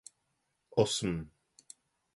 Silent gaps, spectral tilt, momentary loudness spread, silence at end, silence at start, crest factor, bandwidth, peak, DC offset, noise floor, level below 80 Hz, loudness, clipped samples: none; -4.5 dB/octave; 25 LU; 0.9 s; 0.75 s; 24 dB; 11.5 kHz; -12 dBFS; under 0.1%; -80 dBFS; -60 dBFS; -32 LUFS; under 0.1%